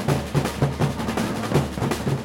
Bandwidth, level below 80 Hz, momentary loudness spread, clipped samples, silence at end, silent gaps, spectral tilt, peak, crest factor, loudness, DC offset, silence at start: 17 kHz; -40 dBFS; 3 LU; under 0.1%; 0 s; none; -6 dB/octave; -6 dBFS; 18 dB; -24 LUFS; under 0.1%; 0 s